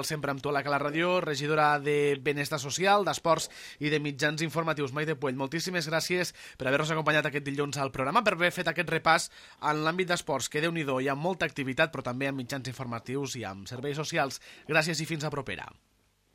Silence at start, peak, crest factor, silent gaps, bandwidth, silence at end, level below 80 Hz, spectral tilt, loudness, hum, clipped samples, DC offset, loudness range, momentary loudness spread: 0 s; -8 dBFS; 22 dB; none; 16 kHz; 0.65 s; -64 dBFS; -4 dB/octave; -29 LUFS; none; under 0.1%; under 0.1%; 5 LU; 10 LU